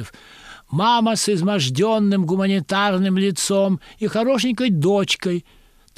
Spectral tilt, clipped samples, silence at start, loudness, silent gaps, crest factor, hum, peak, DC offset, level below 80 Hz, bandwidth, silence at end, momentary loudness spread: -5 dB/octave; under 0.1%; 0 s; -19 LUFS; none; 14 dB; none; -6 dBFS; under 0.1%; -56 dBFS; 15 kHz; 0.55 s; 7 LU